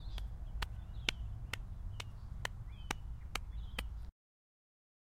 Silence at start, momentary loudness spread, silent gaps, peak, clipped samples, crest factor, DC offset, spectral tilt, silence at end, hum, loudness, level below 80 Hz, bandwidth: 0 s; 9 LU; none; -12 dBFS; under 0.1%; 32 dB; under 0.1%; -3.5 dB/octave; 1 s; none; -45 LUFS; -46 dBFS; 16 kHz